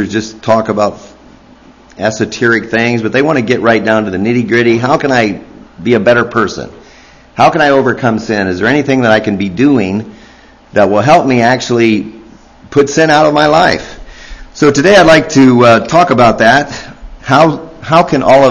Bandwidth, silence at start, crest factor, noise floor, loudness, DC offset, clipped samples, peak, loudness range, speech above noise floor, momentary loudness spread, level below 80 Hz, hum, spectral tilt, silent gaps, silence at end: 11 kHz; 0 s; 10 dB; -40 dBFS; -9 LUFS; under 0.1%; 1%; 0 dBFS; 4 LU; 31 dB; 11 LU; -38 dBFS; none; -5.5 dB/octave; none; 0 s